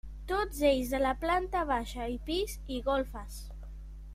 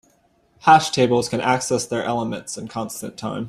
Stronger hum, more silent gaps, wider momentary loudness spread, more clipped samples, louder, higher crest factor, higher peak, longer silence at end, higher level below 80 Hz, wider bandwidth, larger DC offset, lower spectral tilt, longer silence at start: neither; neither; first, 18 LU vs 15 LU; neither; second, -32 LUFS vs -20 LUFS; about the same, 18 dB vs 20 dB; second, -14 dBFS vs -2 dBFS; about the same, 0 s vs 0 s; first, -42 dBFS vs -58 dBFS; first, 16 kHz vs 14.5 kHz; neither; about the same, -4.5 dB/octave vs -4 dB/octave; second, 0.05 s vs 0.65 s